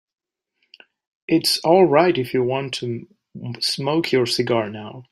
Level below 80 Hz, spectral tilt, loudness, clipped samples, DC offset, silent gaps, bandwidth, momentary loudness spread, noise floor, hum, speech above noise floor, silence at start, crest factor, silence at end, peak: -64 dBFS; -5 dB/octave; -19 LUFS; under 0.1%; under 0.1%; none; 16 kHz; 18 LU; -72 dBFS; none; 52 dB; 1.3 s; 18 dB; 0.1 s; -2 dBFS